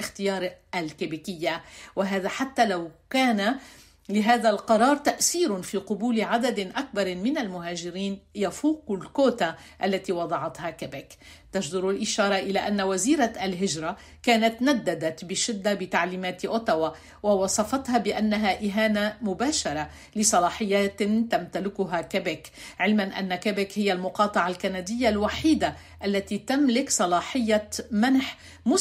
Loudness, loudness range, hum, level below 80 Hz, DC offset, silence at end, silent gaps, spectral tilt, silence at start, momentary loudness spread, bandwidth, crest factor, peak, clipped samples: -26 LUFS; 4 LU; none; -56 dBFS; under 0.1%; 0 s; none; -3.5 dB/octave; 0 s; 9 LU; 16 kHz; 18 dB; -8 dBFS; under 0.1%